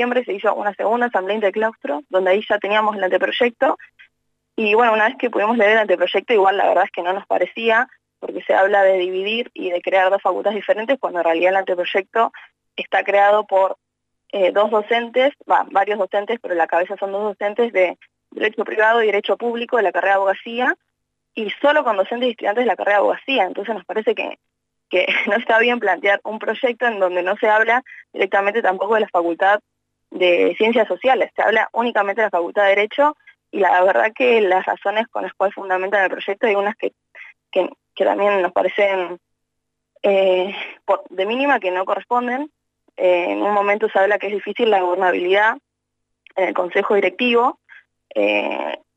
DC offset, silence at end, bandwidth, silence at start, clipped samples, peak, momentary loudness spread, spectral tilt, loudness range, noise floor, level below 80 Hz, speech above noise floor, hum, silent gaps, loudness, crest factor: under 0.1%; 0.2 s; 7.8 kHz; 0 s; under 0.1%; -4 dBFS; 8 LU; -5 dB/octave; 3 LU; -77 dBFS; -74 dBFS; 59 dB; 50 Hz at -80 dBFS; none; -18 LUFS; 14 dB